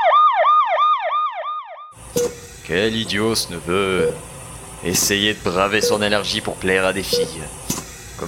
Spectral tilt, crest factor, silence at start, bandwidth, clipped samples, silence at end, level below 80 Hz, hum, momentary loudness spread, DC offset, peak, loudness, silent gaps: -3 dB/octave; 18 dB; 0 s; 17 kHz; under 0.1%; 0 s; -44 dBFS; none; 16 LU; under 0.1%; -2 dBFS; -19 LUFS; none